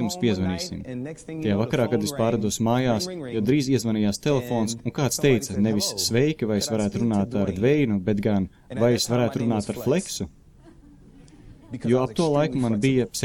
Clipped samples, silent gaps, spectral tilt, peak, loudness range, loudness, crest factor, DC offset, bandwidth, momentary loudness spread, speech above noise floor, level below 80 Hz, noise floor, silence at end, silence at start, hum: under 0.1%; none; -5.5 dB/octave; -8 dBFS; 4 LU; -24 LUFS; 16 dB; under 0.1%; 17.5 kHz; 8 LU; 27 dB; -50 dBFS; -50 dBFS; 0 s; 0 s; none